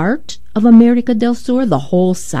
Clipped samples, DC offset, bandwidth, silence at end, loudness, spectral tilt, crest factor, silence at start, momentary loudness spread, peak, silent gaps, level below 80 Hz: 0.4%; 6%; 12 kHz; 0 s; -13 LUFS; -6.5 dB/octave; 12 dB; 0 s; 10 LU; 0 dBFS; none; -46 dBFS